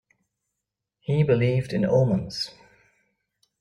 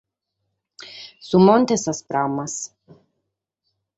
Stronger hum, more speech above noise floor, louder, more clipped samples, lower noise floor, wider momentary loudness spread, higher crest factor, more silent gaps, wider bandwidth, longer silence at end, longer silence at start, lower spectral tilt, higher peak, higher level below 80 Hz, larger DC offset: neither; about the same, 62 dB vs 59 dB; second, -24 LUFS vs -19 LUFS; neither; first, -84 dBFS vs -78 dBFS; second, 11 LU vs 23 LU; about the same, 18 dB vs 20 dB; neither; first, 11 kHz vs 8.2 kHz; second, 1.1 s vs 1.3 s; first, 1.1 s vs 0.8 s; first, -7.5 dB/octave vs -5.5 dB/octave; second, -8 dBFS vs -2 dBFS; first, -56 dBFS vs -64 dBFS; neither